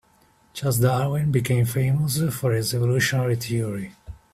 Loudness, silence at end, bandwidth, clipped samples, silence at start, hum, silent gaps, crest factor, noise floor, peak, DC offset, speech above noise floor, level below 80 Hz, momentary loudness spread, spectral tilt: -23 LUFS; 0.2 s; 16 kHz; under 0.1%; 0.55 s; none; none; 16 dB; -59 dBFS; -6 dBFS; under 0.1%; 37 dB; -50 dBFS; 9 LU; -5.5 dB/octave